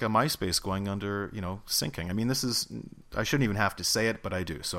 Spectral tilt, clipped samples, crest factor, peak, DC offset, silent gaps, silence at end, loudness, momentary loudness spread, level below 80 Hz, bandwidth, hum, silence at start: -4 dB/octave; under 0.1%; 20 dB; -10 dBFS; under 0.1%; none; 0 s; -29 LUFS; 9 LU; -50 dBFS; 16 kHz; none; 0 s